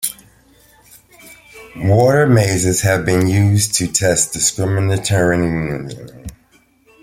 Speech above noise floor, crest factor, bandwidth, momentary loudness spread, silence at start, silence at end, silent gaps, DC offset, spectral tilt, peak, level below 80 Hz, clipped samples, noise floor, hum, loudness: 39 dB; 16 dB; 16.5 kHz; 19 LU; 0 s; 0.7 s; none; under 0.1%; -4.5 dB/octave; 0 dBFS; -44 dBFS; under 0.1%; -54 dBFS; none; -15 LUFS